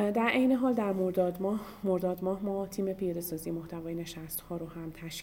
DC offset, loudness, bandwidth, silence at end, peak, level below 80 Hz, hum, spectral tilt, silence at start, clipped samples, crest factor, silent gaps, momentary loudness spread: under 0.1%; -32 LUFS; 17 kHz; 0 s; -14 dBFS; -58 dBFS; none; -6 dB/octave; 0 s; under 0.1%; 18 dB; none; 12 LU